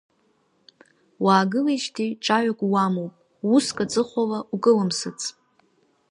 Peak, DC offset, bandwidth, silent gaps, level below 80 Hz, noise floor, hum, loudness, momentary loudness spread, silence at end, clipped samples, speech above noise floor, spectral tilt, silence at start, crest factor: -4 dBFS; under 0.1%; 11.5 kHz; none; -68 dBFS; -66 dBFS; none; -23 LUFS; 11 LU; 0.8 s; under 0.1%; 44 dB; -5 dB/octave; 1.2 s; 20 dB